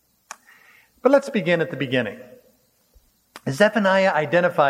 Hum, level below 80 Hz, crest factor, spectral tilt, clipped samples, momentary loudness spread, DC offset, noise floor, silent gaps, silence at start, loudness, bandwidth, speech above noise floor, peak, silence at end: none; -68 dBFS; 20 dB; -5.5 dB/octave; under 0.1%; 17 LU; under 0.1%; -61 dBFS; none; 1.05 s; -20 LUFS; 15.5 kHz; 41 dB; -2 dBFS; 0 s